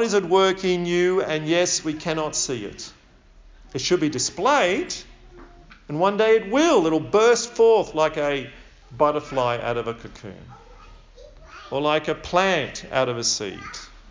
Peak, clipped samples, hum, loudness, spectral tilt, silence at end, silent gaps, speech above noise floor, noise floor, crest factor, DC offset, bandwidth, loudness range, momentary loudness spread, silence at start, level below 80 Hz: -4 dBFS; under 0.1%; none; -21 LUFS; -3.5 dB/octave; 0.15 s; none; 29 dB; -51 dBFS; 18 dB; under 0.1%; 7.6 kHz; 7 LU; 16 LU; 0 s; -50 dBFS